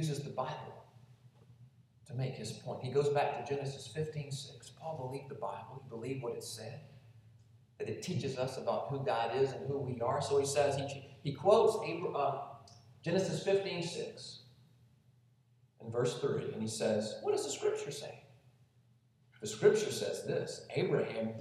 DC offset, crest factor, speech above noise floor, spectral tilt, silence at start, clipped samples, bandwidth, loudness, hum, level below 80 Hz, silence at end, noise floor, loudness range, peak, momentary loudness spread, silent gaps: under 0.1%; 22 dB; 33 dB; -5 dB/octave; 0 s; under 0.1%; 13.5 kHz; -36 LUFS; none; -76 dBFS; 0 s; -68 dBFS; 9 LU; -14 dBFS; 15 LU; none